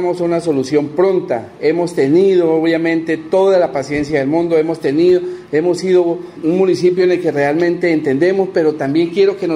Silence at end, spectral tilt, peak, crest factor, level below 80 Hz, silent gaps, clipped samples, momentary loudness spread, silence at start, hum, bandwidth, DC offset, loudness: 0 s; -6.5 dB/octave; -2 dBFS; 12 dB; -54 dBFS; none; under 0.1%; 5 LU; 0 s; none; 11 kHz; under 0.1%; -14 LUFS